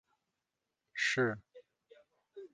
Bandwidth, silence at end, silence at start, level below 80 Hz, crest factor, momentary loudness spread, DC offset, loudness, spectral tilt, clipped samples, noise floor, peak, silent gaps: 9.6 kHz; 0.1 s; 0.95 s; -80 dBFS; 22 dB; 23 LU; under 0.1%; -34 LUFS; -4 dB/octave; under 0.1%; -88 dBFS; -18 dBFS; none